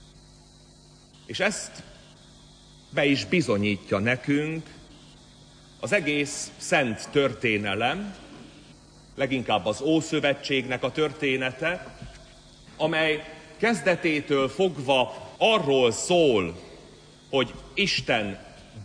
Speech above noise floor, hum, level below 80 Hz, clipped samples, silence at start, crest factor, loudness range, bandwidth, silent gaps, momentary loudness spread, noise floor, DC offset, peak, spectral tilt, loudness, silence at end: 28 dB; none; -56 dBFS; under 0.1%; 1.3 s; 18 dB; 4 LU; 10.5 kHz; none; 17 LU; -53 dBFS; under 0.1%; -10 dBFS; -4.5 dB/octave; -25 LUFS; 0 s